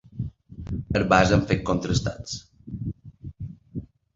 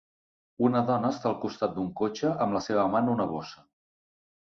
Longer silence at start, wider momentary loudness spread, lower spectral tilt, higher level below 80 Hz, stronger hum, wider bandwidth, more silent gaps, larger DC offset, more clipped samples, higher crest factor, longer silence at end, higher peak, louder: second, 0.15 s vs 0.6 s; first, 21 LU vs 6 LU; second, -5.5 dB/octave vs -7 dB/octave; first, -40 dBFS vs -64 dBFS; neither; first, 7.8 kHz vs 7 kHz; neither; neither; neither; first, 24 dB vs 18 dB; second, 0.3 s vs 0.95 s; first, -2 dBFS vs -10 dBFS; first, -25 LUFS vs -28 LUFS